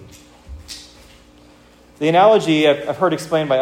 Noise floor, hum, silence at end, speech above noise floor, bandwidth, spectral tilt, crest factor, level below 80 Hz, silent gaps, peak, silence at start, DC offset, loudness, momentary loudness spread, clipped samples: -48 dBFS; none; 0 s; 33 dB; 16 kHz; -5.5 dB/octave; 16 dB; -48 dBFS; none; -2 dBFS; 0 s; under 0.1%; -16 LUFS; 22 LU; under 0.1%